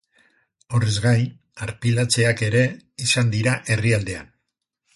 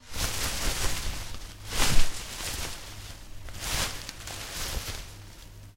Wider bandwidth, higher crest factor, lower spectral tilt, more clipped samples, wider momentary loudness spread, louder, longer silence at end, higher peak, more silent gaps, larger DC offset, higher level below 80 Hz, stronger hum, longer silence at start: second, 11.5 kHz vs 16 kHz; about the same, 16 dB vs 20 dB; first, -4.5 dB/octave vs -2 dB/octave; neither; second, 11 LU vs 16 LU; first, -21 LUFS vs -32 LUFS; first, 0.7 s vs 0.05 s; about the same, -6 dBFS vs -6 dBFS; neither; neither; second, -48 dBFS vs -34 dBFS; neither; first, 0.7 s vs 0.05 s